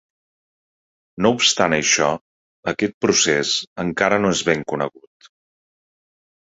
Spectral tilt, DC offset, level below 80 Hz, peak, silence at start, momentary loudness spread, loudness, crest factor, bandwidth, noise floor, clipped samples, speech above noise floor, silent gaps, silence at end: -2.5 dB/octave; under 0.1%; -54 dBFS; -2 dBFS; 1.15 s; 10 LU; -18 LUFS; 20 dB; 8 kHz; under -90 dBFS; under 0.1%; over 71 dB; 2.21-2.63 s, 2.94-3.01 s, 3.67-3.76 s; 1.6 s